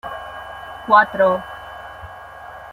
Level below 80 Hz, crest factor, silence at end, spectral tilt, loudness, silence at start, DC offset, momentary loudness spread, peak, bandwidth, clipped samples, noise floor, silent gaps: -50 dBFS; 20 dB; 0 s; -5.5 dB/octave; -16 LUFS; 0.05 s; under 0.1%; 22 LU; -2 dBFS; 15.5 kHz; under 0.1%; -37 dBFS; none